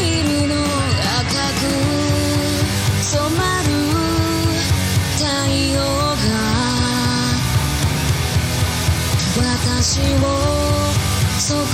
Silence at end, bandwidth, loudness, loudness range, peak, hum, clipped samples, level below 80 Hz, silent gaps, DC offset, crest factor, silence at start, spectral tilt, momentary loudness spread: 0 s; 16.5 kHz; -17 LUFS; 0 LU; -4 dBFS; none; under 0.1%; -30 dBFS; none; under 0.1%; 14 dB; 0 s; -4.5 dB/octave; 1 LU